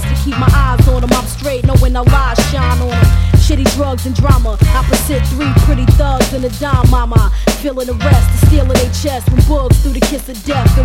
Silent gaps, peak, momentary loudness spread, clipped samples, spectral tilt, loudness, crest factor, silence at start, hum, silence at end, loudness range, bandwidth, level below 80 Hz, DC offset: none; 0 dBFS; 6 LU; 0.8%; -6 dB/octave; -12 LUFS; 10 dB; 0 s; none; 0 s; 1 LU; 16.5 kHz; -14 dBFS; under 0.1%